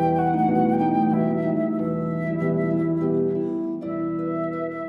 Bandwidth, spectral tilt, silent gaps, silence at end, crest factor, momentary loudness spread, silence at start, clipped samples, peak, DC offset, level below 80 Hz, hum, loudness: 4.9 kHz; -10.5 dB/octave; none; 0 s; 14 dB; 7 LU; 0 s; under 0.1%; -10 dBFS; under 0.1%; -56 dBFS; none; -23 LUFS